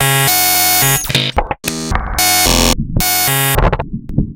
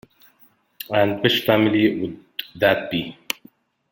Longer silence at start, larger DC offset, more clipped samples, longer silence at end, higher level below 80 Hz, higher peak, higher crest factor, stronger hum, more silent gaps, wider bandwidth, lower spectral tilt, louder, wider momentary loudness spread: second, 0 s vs 0.8 s; neither; neither; second, 0 s vs 0.8 s; first, -22 dBFS vs -58 dBFS; about the same, 0 dBFS vs -2 dBFS; second, 14 dB vs 20 dB; neither; neither; about the same, 17.5 kHz vs 17 kHz; second, -2.5 dB/octave vs -5.5 dB/octave; first, -12 LUFS vs -21 LUFS; second, 10 LU vs 13 LU